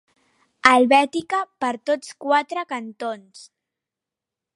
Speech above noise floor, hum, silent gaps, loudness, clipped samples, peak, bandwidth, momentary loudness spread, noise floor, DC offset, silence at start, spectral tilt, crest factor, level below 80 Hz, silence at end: 66 dB; none; none; -20 LUFS; under 0.1%; 0 dBFS; 11.5 kHz; 15 LU; -87 dBFS; under 0.1%; 0.65 s; -3 dB/octave; 22 dB; -68 dBFS; 1.15 s